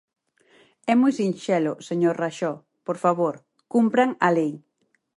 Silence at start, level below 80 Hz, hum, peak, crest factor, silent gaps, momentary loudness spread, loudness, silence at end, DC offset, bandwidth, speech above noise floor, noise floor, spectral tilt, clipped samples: 0.85 s; -74 dBFS; none; -6 dBFS; 18 dB; none; 12 LU; -23 LUFS; 0.6 s; under 0.1%; 11 kHz; 37 dB; -59 dBFS; -6.5 dB/octave; under 0.1%